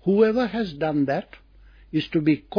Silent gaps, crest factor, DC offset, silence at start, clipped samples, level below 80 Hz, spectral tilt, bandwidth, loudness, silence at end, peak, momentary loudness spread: none; 16 dB; under 0.1%; 0.05 s; under 0.1%; -52 dBFS; -8.5 dB/octave; 5.4 kHz; -23 LUFS; 0 s; -8 dBFS; 9 LU